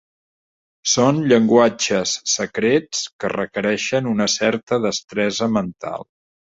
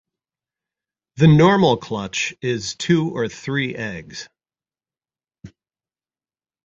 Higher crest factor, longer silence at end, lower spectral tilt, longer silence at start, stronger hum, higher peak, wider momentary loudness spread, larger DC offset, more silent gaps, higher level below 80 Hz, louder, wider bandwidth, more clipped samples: about the same, 18 dB vs 20 dB; second, 0.45 s vs 1.15 s; second, -3.5 dB/octave vs -6 dB/octave; second, 0.85 s vs 1.15 s; neither; about the same, -2 dBFS vs -2 dBFS; second, 10 LU vs 16 LU; neither; first, 3.13-3.19 s, 4.63-4.67 s vs none; second, -58 dBFS vs -52 dBFS; about the same, -19 LUFS vs -19 LUFS; about the same, 8 kHz vs 7.6 kHz; neither